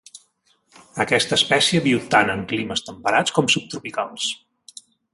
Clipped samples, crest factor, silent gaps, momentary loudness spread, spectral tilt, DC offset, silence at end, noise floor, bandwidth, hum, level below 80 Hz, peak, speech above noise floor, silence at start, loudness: under 0.1%; 20 dB; none; 11 LU; -3 dB/octave; under 0.1%; 0.75 s; -64 dBFS; 11.5 kHz; none; -58 dBFS; -2 dBFS; 43 dB; 0.15 s; -20 LUFS